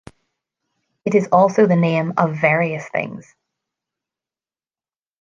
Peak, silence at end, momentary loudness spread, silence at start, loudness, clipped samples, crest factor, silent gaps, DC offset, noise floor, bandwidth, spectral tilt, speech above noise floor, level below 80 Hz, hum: -2 dBFS; 2 s; 13 LU; 1.05 s; -17 LUFS; under 0.1%; 18 dB; none; under 0.1%; under -90 dBFS; 7.4 kHz; -7.5 dB/octave; over 73 dB; -64 dBFS; none